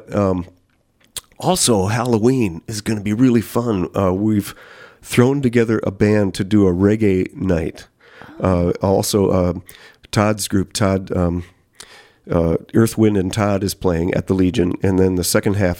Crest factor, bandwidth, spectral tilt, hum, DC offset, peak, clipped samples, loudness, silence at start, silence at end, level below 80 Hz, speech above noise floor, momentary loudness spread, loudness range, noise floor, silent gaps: 18 dB; 17 kHz; -6 dB/octave; none; under 0.1%; 0 dBFS; under 0.1%; -18 LUFS; 0.1 s; 0 s; -42 dBFS; 42 dB; 7 LU; 2 LU; -59 dBFS; none